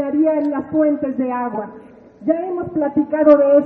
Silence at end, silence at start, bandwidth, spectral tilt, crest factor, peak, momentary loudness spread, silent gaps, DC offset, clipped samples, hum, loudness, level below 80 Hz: 0 s; 0 s; 3.2 kHz; -7.5 dB/octave; 16 dB; 0 dBFS; 13 LU; none; under 0.1%; under 0.1%; none; -18 LUFS; -56 dBFS